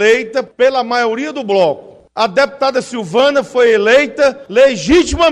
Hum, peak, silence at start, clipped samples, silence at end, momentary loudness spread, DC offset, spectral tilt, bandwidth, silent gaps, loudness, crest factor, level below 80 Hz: none; 0 dBFS; 0 s; under 0.1%; 0 s; 8 LU; under 0.1%; -4 dB/octave; 10.5 kHz; none; -13 LUFS; 12 dB; -36 dBFS